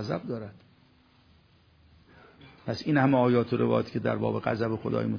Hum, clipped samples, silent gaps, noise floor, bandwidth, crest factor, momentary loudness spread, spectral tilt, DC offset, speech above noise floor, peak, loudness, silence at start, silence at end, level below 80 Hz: none; under 0.1%; none; -61 dBFS; 5.4 kHz; 20 dB; 14 LU; -8.5 dB/octave; under 0.1%; 34 dB; -10 dBFS; -27 LUFS; 0 s; 0 s; -62 dBFS